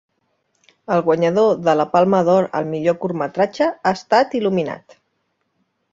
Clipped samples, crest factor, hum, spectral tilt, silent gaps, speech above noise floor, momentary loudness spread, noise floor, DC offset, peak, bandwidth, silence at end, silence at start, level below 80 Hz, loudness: under 0.1%; 18 dB; none; -6.5 dB/octave; none; 53 dB; 7 LU; -70 dBFS; under 0.1%; -2 dBFS; 7.8 kHz; 1.15 s; 0.9 s; -62 dBFS; -18 LUFS